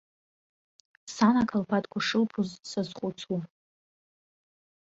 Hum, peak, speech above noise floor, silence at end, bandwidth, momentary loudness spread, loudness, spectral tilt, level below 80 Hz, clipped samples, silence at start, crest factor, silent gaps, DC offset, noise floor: none; -10 dBFS; over 62 dB; 1.45 s; 8 kHz; 14 LU; -29 LUFS; -5.5 dB/octave; -66 dBFS; under 0.1%; 1.05 s; 22 dB; none; under 0.1%; under -90 dBFS